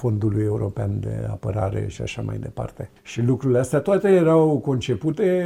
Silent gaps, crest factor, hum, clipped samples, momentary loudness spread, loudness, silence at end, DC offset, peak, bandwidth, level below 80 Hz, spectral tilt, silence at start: none; 14 dB; none; under 0.1%; 13 LU; -22 LUFS; 0 s; under 0.1%; -6 dBFS; 13 kHz; -46 dBFS; -7.5 dB/octave; 0 s